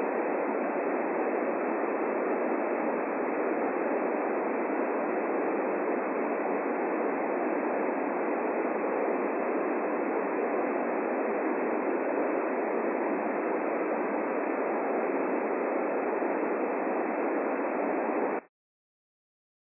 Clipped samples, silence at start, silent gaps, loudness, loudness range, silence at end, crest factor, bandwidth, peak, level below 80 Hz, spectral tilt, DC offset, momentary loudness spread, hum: under 0.1%; 0 s; none; -30 LUFS; 0 LU; 1.25 s; 12 dB; 2.8 kHz; -16 dBFS; under -90 dBFS; -9.5 dB/octave; under 0.1%; 1 LU; none